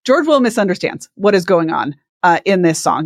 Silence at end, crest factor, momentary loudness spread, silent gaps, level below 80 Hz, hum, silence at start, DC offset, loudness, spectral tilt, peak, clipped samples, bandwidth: 0 s; 14 dB; 8 LU; 2.09-2.20 s; -62 dBFS; none; 0.05 s; under 0.1%; -15 LUFS; -5 dB/octave; 0 dBFS; under 0.1%; 15 kHz